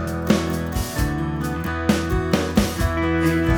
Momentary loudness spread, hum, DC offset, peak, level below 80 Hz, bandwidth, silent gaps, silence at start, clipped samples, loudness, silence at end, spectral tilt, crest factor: 5 LU; none; under 0.1%; -2 dBFS; -30 dBFS; over 20 kHz; none; 0 s; under 0.1%; -22 LUFS; 0 s; -6 dB/octave; 18 dB